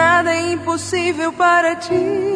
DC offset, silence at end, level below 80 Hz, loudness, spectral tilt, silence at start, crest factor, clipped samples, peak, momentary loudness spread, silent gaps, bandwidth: under 0.1%; 0 s; -56 dBFS; -17 LUFS; -4 dB/octave; 0 s; 16 dB; under 0.1%; -2 dBFS; 7 LU; none; 10.5 kHz